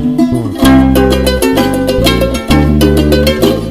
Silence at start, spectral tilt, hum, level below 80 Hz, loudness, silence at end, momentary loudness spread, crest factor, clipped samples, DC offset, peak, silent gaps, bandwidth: 0 s; -6 dB/octave; none; -18 dBFS; -9 LUFS; 0 s; 4 LU; 8 dB; 0.7%; under 0.1%; 0 dBFS; none; 15 kHz